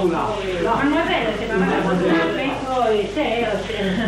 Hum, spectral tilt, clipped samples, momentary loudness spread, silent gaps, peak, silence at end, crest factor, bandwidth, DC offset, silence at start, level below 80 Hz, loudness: none; -6 dB/octave; under 0.1%; 4 LU; none; -8 dBFS; 0 s; 12 dB; 15 kHz; under 0.1%; 0 s; -40 dBFS; -20 LUFS